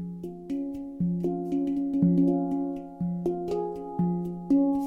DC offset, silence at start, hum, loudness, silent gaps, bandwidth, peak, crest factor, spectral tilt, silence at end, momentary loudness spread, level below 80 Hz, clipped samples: under 0.1%; 0 s; none; -28 LUFS; none; 5.2 kHz; -10 dBFS; 16 dB; -11 dB/octave; 0 s; 10 LU; -56 dBFS; under 0.1%